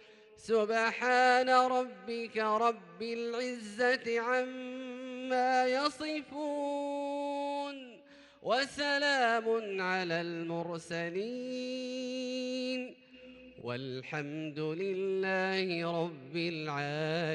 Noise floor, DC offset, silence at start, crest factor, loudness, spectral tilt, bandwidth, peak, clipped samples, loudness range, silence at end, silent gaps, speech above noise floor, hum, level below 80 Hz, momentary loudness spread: -57 dBFS; under 0.1%; 0 s; 18 dB; -33 LUFS; -4.5 dB/octave; 11.5 kHz; -16 dBFS; under 0.1%; 8 LU; 0 s; none; 25 dB; none; -78 dBFS; 12 LU